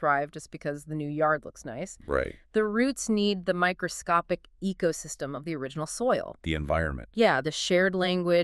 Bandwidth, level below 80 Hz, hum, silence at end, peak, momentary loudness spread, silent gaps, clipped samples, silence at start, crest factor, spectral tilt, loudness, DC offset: 13.5 kHz; -48 dBFS; none; 0 s; -10 dBFS; 11 LU; none; under 0.1%; 0 s; 18 dB; -4.5 dB/octave; -28 LUFS; under 0.1%